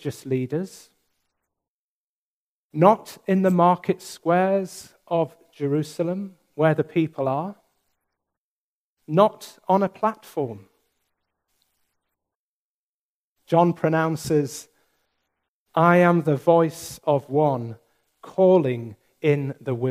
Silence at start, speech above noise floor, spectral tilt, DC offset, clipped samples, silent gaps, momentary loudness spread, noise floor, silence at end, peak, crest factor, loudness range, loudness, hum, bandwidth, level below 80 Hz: 0.05 s; over 68 dB; -7 dB/octave; under 0.1%; under 0.1%; 1.68-2.70 s, 8.38-8.97 s, 12.35-13.36 s, 15.48-15.66 s; 14 LU; under -90 dBFS; 0 s; -2 dBFS; 22 dB; 6 LU; -22 LUFS; none; 15.5 kHz; -68 dBFS